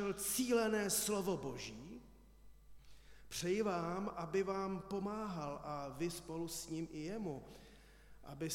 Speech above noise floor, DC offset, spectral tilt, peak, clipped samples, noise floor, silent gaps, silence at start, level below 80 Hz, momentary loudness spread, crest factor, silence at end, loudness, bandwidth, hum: 20 dB; under 0.1%; -4 dB/octave; -24 dBFS; under 0.1%; -61 dBFS; none; 0 s; -64 dBFS; 17 LU; 18 dB; 0 s; -40 LUFS; 17.5 kHz; none